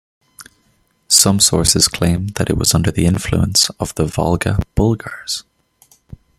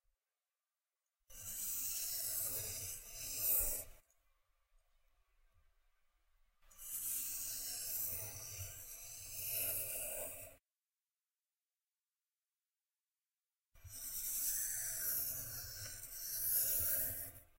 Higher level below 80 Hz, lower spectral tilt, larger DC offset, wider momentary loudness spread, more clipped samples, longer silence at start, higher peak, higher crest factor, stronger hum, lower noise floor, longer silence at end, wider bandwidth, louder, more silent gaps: first, -34 dBFS vs -62 dBFS; first, -3.5 dB/octave vs -0.5 dB/octave; neither; second, 11 LU vs 14 LU; neither; second, 0.4 s vs 1.3 s; first, 0 dBFS vs -20 dBFS; second, 18 dB vs 24 dB; neither; second, -60 dBFS vs under -90 dBFS; first, 0.95 s vs 0.15 s; about the same, 17 kHz vs 16 kHz; first, -15 LUFS vs -39 LUFS; neither